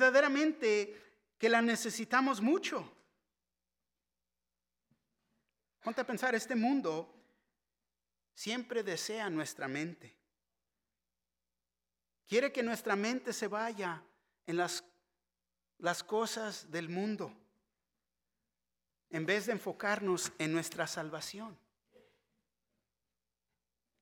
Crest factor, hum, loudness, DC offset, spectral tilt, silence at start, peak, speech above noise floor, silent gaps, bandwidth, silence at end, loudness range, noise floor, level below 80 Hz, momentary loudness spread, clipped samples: 22 dB; none; -35 LUFS; under 0.1%; -3.5 dB/octave; 0 s; -14 dBFS; over 55 dB; none; 17.5 kHz; 2.45 s; 8 LU; under -90 dBFS; -86 dBFS; 12 LU; under 0.1%